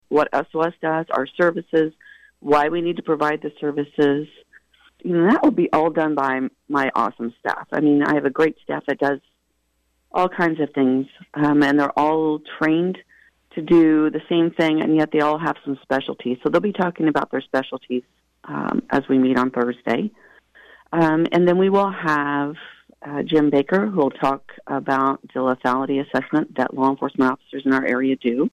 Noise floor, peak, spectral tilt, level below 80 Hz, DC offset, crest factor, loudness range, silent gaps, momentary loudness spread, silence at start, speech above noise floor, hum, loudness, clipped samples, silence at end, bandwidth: -69 dBFS; -8 dBFS; -7.5 dB/octave; -62 dBFS; under 0.1%; 12 dB; 3 LU; none; 10 LU; 0.1 s; 49 dB; none; -20 LUFS; under 0.1%; 0.05 s; 8.8 kHz